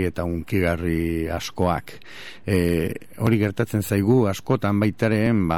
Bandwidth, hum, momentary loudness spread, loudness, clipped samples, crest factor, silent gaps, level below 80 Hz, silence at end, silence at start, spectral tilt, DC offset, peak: 18 kHz; none; 9 LU; -23 LUFS; under 0.1%; 16 dB; none; -42 dBFS; 0 s; 0 s; -7 dB/octave; 0.9%; -6 dBFS